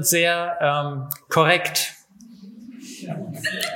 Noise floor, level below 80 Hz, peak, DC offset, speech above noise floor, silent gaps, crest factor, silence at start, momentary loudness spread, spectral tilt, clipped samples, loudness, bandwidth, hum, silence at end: -46 dBFS; -70 dBFS; -2 dBFS; under 0.1%; 25 dB; none; 22 dB; 0 s; 21 LU; -3 dB/octave; under 0.1%; -21 LUFS; 17 kHz; none; 0 s